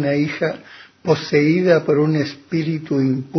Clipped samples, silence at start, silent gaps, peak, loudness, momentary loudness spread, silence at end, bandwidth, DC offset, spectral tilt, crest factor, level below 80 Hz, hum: under 0.1%; 0 s; none; -2 dBFS; -19 LUFS; 8 LU; 0 s; 6.4 kHz; under 0.1%; -7.5 dB/octave; 16 dB; -60 dBFS; none